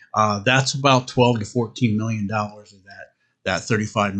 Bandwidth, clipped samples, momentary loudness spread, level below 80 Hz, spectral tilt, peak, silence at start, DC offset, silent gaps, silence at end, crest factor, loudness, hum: 9 kHz; under 0.1%; 8 LU; -58 dBFS; -5 dB/octave; -2 dBFS; 0.15 s; under 0.1%; none; 0 s; 18 dB; -20 LUFS; none